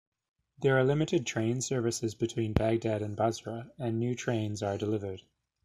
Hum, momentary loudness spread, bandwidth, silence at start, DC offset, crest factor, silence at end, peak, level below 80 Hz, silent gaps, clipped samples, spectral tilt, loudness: none; 9 LU; 13.5 kHz; 0.6 s; under 0.1%; 24 dB; 0.45 s; -8 dBFS; -54 dBFS; none; under 0.1%; -5.5 dB/octave; -31 LUFS